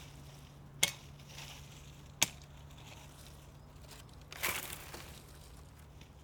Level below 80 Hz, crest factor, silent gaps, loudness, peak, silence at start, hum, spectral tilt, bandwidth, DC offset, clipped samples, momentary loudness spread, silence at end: -60 dBFS; 36 dB; none; -38 LUFS; -8 dBFS; 0 s; none; -1 dB/octave; over 20 kHz; under 0.1%; under 0.1%; 21 LU; 0 s